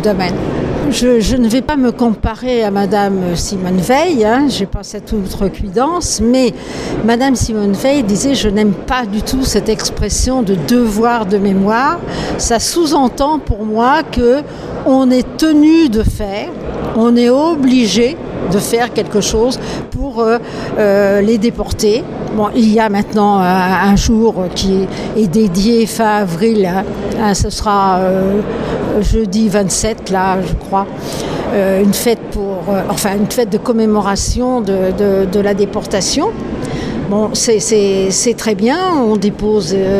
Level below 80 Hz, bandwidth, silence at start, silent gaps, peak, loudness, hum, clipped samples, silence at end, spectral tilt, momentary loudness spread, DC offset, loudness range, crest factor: -28 dBFS; 15.5 kHz; 0 s; none; 0 dBFS; -13 LUFS; none; under 0.1%; 0 s; -5 dB/octave; 7 LU; under 0.1%; 3 LU; 12 dB